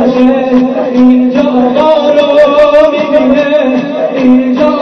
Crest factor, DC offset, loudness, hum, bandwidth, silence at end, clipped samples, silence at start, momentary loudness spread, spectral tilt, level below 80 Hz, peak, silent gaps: 6 dB; under 0.1%; -7 LUFS; none; 6.4 kHz; 0 s; 3%; 0 s; 4 LU; -6.5 dB/octave; -40 dBFS; 0 dBFS; none